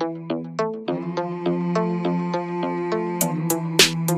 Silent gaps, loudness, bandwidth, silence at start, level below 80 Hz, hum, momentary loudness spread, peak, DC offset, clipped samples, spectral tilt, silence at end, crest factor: none; -23 LUFS; 15.5 kHz; 0 s; -60 dBFS; none; 11 LU; 0 dBFS; under 0.1%; under 0.1%; -4 dB/octave; 0 s; 22 dB